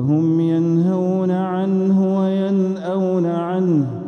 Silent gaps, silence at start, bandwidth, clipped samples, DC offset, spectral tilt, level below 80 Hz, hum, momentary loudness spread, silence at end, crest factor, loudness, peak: none; 0 s; 6.6 kHz; under 0.1%; under 0.1%; -10 dB/octave; -62 dBFS; none; 3 LU; 0 s; 10 dB; -18 LUFS; -8 dBFS